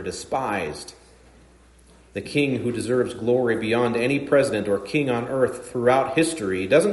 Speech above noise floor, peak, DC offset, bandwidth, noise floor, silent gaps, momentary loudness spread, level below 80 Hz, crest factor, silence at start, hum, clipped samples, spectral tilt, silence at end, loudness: 30 dB; -6 dBFS; under 0.1%; 11.5 kHz; -52 dBFS; none; 8 LU; -56 dBFS; 18 dB; 0 s; none; under 0.1%; -5.5 dB/octave; 0 s; -23 LUFS